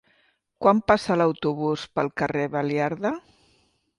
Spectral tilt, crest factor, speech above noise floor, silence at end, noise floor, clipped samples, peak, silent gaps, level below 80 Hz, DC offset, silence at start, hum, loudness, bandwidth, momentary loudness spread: -6.5 dB/octave; 20 dB; 42 dB; 0.8 s; -66 dBFS; under 0.1%; -4 dBFS; none; -56 dBFS; under 0.1%; 0.6 s; none; -24 LUFS; 11.5 kHz; 7 LU